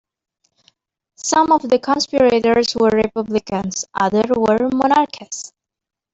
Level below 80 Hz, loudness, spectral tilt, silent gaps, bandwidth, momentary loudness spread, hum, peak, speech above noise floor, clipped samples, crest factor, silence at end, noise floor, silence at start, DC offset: -52 dBFS; -17 LUFS; -4 dB/octave; none; 8.2 kHz; 11 LU; none; -2 dBFS; 44 dB; under 0.1%; 16 dB; 0.65 s; -60 dBFS; 1.25 s; under 0.1%